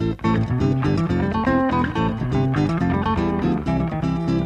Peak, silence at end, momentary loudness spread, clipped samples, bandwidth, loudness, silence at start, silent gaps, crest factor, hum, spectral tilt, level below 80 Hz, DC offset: -8 dBFS; 0 s; 3 LU; under 0.1%; 8.8 kHz; -21 LUFS; 0 s; none; 12 dB; none; -8.5 dB/octave; -36 dBFS; under 0.1%